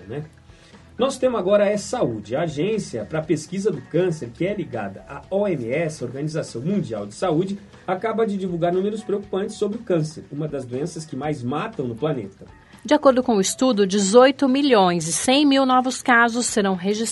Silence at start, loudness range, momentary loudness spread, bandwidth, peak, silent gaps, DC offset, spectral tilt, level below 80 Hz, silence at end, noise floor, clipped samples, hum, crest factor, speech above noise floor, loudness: 0 s; 9 LU; 13 LU; 11.5 kHz; -2 dBFS; none; under 0.1%; -4.5 dB/octave; -56 dBFS; 0 s; -47 dBFS; under 0.1%; none; 20 dB; 26 dB; -21 LUFS